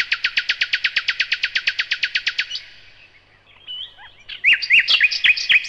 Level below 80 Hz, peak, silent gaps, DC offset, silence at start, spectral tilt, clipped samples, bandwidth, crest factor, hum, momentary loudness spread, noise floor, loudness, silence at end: -58 dBFS; -4 dBFS; none; 0.1%; 0 s; 2 dB/octave; under 0.1%; 12.5 kHz; 16 dB; none; 18 LU; -52 dBFS; -17 LUFS; 0 s